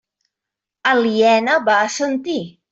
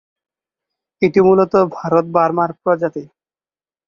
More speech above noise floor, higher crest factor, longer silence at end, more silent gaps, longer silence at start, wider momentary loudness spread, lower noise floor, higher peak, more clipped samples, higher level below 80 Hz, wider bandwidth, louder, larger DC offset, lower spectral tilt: second, 68 dB vs over 75 dB; about the same, 16 dB vs 16 dB; second, 0.2 s vs 0.8 s; neither; second, 0.85 s vs 1 s; about the same, 9 LU vs 7 LU; second, -85 dBFS vs under -90 dBFS; about the same, -2 dBFS vs 0 dBFS; neither; second, -66 dBFS vs -56 dBFS; first, 8.2 kHz vs 7 kHz; about the same, -17 LUFS vs -15 LUFS; neither; second, -3.5 dB/octave vs -8.5 dB/octave